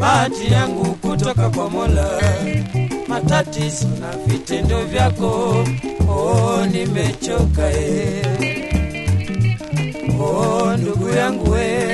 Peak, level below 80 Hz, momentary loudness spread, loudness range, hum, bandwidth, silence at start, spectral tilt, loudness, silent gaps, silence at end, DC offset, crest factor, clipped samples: -2 dBFS; -28 dBFS; 5 LU; 1 LU; none; 12 kHz; 0 s; -6 dB/octave; -18 LUFS; none; 0 s; under 0.1%; 16 dB; under 0.1%